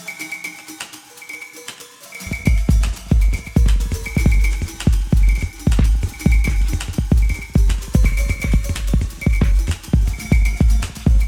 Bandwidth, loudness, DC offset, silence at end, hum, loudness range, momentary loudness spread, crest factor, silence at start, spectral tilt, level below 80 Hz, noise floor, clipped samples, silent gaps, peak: 15.5 kHz; -19 LUFS; under 0.1%; 0 s; none; 3 LU; 14 LU; 14 dB; 0 s; -6 dB/octave; -18 dBFS; -37 dBFS; under 0.1%; none; -2 dBFS